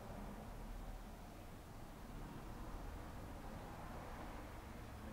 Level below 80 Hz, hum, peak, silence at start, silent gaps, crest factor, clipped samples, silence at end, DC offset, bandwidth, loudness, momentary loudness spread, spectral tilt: -54 dBFS; none; -38 dBFS; 0 s; none; 14 dB; under 0.1%; 0 s; under 0.1%; 16 kHz; -53 LUFS; 4 LU; -6 dB/octave